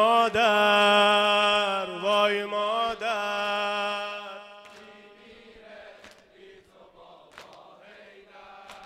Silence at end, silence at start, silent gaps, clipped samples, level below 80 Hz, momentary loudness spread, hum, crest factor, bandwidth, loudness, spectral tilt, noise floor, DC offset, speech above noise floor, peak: 0 s; 0 s; none; under 0.1%; -66 dBFS; 17 LU; none; 16 dB; 15.5 kHz; -23 LUFS; -3 dB/octave; -53 dBFS; under 0.1%; 32 dB; -10 dBFS